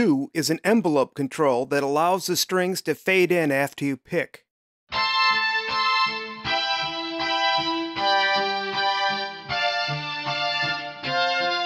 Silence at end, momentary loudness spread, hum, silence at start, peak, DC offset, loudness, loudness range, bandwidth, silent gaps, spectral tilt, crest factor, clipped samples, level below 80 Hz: 0 s; 7 LU; none; 0 s; -8 dBFS; under 0.1%; -23 LUFS; 1 LU; 16 kHz; 4.51-4.87 s; -3.5 dB/octave; 16 dB; under 0.1%; -62 dBFS